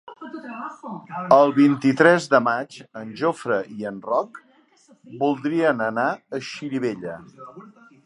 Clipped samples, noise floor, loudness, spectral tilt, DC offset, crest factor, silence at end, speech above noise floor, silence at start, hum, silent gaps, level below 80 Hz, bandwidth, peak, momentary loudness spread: under 0.1%; -56 dBFS; -21 LUFS; -6 dB/octave; under 0.1%; 22 dB; 0.35 s; 35 dB; 0.05 s; none; none; -72 dBFS; 11 kHz; 0 dBFS; 21 LU